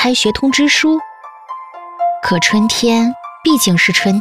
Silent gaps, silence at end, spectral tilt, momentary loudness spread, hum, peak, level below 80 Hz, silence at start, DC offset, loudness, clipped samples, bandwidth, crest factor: none; 0 s; -3.5 dB/octave; 19 LU; none; 0 dBFS; -46 dBFS; 0 s; under 0.1%; -13 LUFS; under 0.1%; 16 kHz; 14 dB